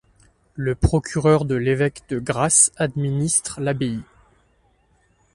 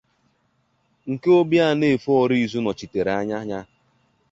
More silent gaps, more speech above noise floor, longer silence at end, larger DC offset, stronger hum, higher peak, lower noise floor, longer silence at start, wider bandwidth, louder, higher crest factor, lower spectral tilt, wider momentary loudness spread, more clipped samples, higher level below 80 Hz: neither; second, 41 dB vs 47 dB; first, 1.3 s vs 0.65 s; neither; neither; first, -2 dBFS vs -6 dBFS; second, -61 dBFS vs -67 dBFS; second, 0.55 s vs 1.05 s; first, 11.5 kHz vs 7.8 kHz; about the same, -20 LUFS vs -21 LUFS; about the same, 20 dB vs 16 dB; second, -4.5 dB/octave vs -7 dB/octave; about the same, 13 LU vs 14 LU; neither; first, -38 dBFS vs -58 dBFS